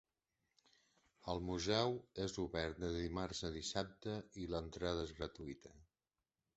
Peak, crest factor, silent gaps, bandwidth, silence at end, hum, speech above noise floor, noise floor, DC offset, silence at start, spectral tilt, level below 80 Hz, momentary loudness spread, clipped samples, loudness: -20 dBFS; 24 dB; none; 8 kHz; 0.75 s; none; over 47 dB; under -90 dBFS; under 0.1%; 1.25 s; -4.5 dB/octave; -58 dBFS; 10 LU; under 0.1%; -43 LUFS